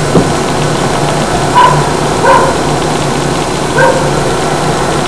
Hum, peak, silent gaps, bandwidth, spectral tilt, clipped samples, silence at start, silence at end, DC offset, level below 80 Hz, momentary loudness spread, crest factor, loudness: none; 0 dBFS; none; 11 kHz; -4.5 dB/octave; 2%; 0 s; 0 s; 6%; -28 dBFS; 5 LU; 10 dB; -10 LUFS